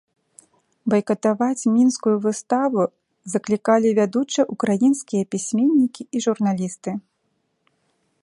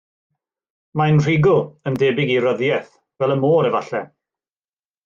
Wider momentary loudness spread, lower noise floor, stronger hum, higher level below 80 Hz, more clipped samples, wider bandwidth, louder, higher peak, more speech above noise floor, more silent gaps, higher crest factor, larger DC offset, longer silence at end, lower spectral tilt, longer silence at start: about the same, 10 LU vs 10 LU; second, -71 dBFS vs under -90 dBFS; neither; second, -68 dBFS vs -56 dBFS; neither; first, 11.5 kHz vs 7.2 kHz; second, -21 LUFS vs -18 LUFS; about the same, -4 dBFS vs -6 dBFS; second, 51 dB vs over 73 dB; neither; about the same, 18 dB vs 14 dB; neither; first, 1.2 s vs 1 s; second, -5.5 dB/octave vs -7.5 dB/octave; about the same, 0.85 s vs 0.95 s